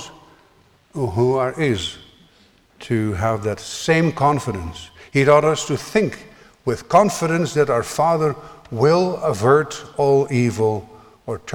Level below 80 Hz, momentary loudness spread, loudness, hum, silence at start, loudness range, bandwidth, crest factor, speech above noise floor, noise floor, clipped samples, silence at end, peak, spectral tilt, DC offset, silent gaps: -48 dBFS; 14 LU; -19 LUFS; none; 0 s; 4 LU; 18 kHz; 18 dB; 36 dB; -55 dBFS; under 0.1%; 0 s; -2 dBFS; -5.5 dB/octave; under 0.1%; none